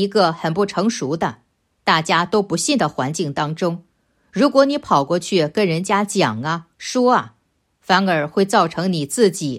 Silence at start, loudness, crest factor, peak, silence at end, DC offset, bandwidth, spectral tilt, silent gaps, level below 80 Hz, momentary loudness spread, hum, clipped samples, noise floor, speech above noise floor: 0 s; -18 LUFS; 18 dB; 0 dBFS; 0 s; under 0.1%; 15.5 kHz; -4.5 dB/octave; none; -60 dBFS; 8 LU; none; under 0.1%; -65 dBFS; 47 dB